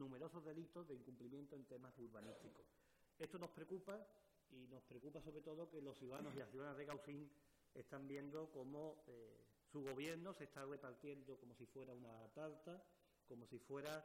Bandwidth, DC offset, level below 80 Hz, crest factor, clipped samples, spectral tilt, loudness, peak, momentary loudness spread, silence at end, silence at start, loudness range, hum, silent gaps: 16 kHz; under 0.1%; -84 dBFS; 16 dB; under 0.1%; -6 dB/octave; -57 LUFS; -40 dBFS; 10 LU; 0 s; 0 s; 4 LU; none; none